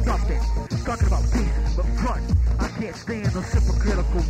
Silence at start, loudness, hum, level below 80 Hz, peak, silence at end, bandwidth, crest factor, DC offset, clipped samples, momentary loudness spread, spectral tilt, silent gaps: 0 s; -24 LUFS; none; -22 dBFS; -8 dBFS; 0 s; 9 kHz; 12 dB; under 0.1%; under 0.1%; 5 LU; -6.5 dB/octave; none